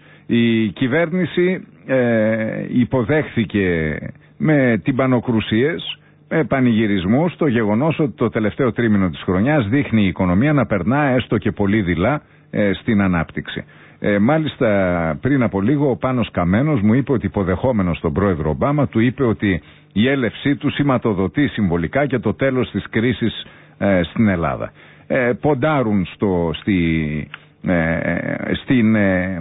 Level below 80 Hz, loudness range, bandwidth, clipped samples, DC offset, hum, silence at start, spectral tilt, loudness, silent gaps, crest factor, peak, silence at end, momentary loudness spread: -38 dBFS; 2 LU; 4 kHz; under 0.1%; under 0.1%; none; 0.3 s; -12.5 dB/octave; -18 LUFS; none; 12 dB; -6 dBFS; 0 s; 7 LU